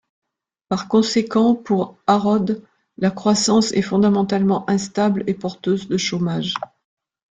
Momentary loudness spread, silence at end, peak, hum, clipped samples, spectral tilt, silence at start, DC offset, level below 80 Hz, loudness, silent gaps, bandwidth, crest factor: 8 LU; 0.65 s; -2 dBFS; none; under 0.1%; -5.5 dB/octave; 0.7 s; under 0.1%; -58 dBFS; -19 LUFS; none; 9.4 kHz; 16 dB